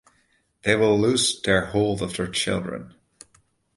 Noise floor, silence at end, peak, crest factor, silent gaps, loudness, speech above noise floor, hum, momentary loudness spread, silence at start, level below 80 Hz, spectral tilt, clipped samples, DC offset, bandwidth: -66 dBFS; 0.9 s; -2 dBFS; 22 dB; none; -22 LUFS; 44 dB; none; 10 LU; 0.65 s; -50 dBFS; -4 dB/octave; under 0.1%; under 0.1%; 11.5 kHz